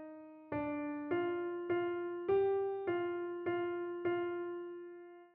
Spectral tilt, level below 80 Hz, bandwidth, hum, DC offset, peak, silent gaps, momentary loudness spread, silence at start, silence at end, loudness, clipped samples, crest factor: -5.5 dB/octave; -74 dBFS; 3.8 kHz; none; under 0.1%; -24 dBFS; none; 14 LU; 0 s; 0.05 s; -38 LUFS; under 0.1%; 14 dB